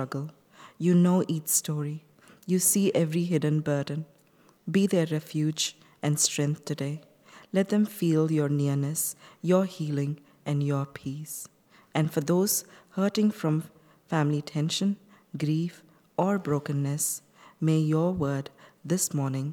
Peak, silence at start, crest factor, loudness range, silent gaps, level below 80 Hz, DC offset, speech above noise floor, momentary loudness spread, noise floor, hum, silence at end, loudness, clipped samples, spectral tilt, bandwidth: -10 dBFS; 0 s; 18 dB; 4 LU; none; -68 dBFS; under 0.1%; 34 dB; 12 LU; -61 dBFS; none; 0 s; -27 LUFS; under 0.1%; -5 dB/octave; 19 kHz